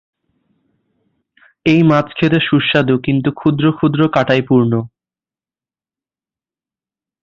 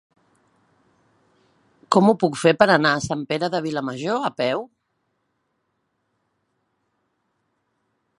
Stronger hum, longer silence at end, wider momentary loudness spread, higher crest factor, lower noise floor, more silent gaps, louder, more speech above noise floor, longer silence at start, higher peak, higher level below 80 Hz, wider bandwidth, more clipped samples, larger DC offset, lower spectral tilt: neither; second, 2.35 s vs 3.55 s; second, 5 LU vs 10 LU; second, 16 dB vs 24 dB; first, under -90 dBFS vs -73 dBFS; neither; first, -14 LUFS vs -20 LUFS; first, over 77 dB vs 53 dB; second, 1.65 s vs 1.9 s; about the same, 0 dBFS vs 0 dBFS; first, -50 dBFS vs -62 dBFS; second, 7 kHz vs 11.5 kHz; neither; neither; first, -8 dB/octave vs -5 dB/octave